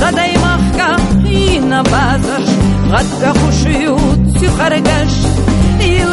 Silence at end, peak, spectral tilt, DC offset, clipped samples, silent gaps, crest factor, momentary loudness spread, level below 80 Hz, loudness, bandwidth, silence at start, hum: 0 s; 0 dBFS; -5.5 dB/octave; under 0.1%; under 0.1%; none; 10 dB; 2 LU; -18 dBFS; -11 LUFS; 11.5 kHz; 0 s; none